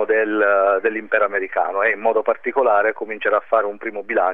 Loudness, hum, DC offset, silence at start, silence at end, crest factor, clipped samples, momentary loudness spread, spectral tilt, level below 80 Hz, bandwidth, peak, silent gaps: -19 LUFS; none; 0.7%; 0 s; 0 s; 16 dB; under 0.1%; 6 LU; -7 dB/octave; -68 dBFS; 3.9 kHz; -4 dBFS; none